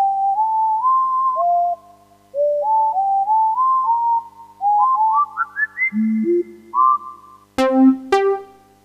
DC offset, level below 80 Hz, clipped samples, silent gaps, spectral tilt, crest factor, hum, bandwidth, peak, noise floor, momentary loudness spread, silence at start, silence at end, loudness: under 0.1%; -62 dBFS; under 0.1%; none; -6 dB/octave; 14 dB; 50 Hz at -60 dBFS; 11.5 kHz; -4 dBFS; -49 dBFS; 8 LU; 0 s; 0.4 s; -18 LUFS